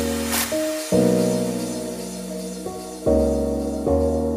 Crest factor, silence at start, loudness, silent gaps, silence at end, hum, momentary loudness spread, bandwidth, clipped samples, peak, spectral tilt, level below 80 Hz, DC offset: 16 dB; 0 s; -23 LUFS; none; 0 s; none; 11 LU; 16 kHz; under 0.1%; -6 dBFS; -5 dB/octave; -36 dBFS; under 0.1%